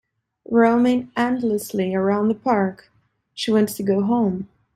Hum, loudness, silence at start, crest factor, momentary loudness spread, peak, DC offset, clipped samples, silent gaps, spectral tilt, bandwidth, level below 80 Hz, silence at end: none; -20 LUFS; 0.5 s; 16 dB; 8 LU; -6 dBFS; under 0.1%; under 0.1%; none; -6 dB/octave; 15.5 kHz; -60 dBFS; 0.3 s